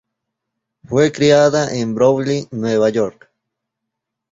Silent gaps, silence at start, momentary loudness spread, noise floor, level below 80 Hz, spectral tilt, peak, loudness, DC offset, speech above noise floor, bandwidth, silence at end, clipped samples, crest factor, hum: none; 0.9 s; 9 LU; -79 dBFS; -54 dBFS; -5.5 dB/octave; 0 dBFS; -16 LUFS; under 0.1%; 65 dB; 7.8 kHz; 1.2 s; under 0.1%; 18 dB; none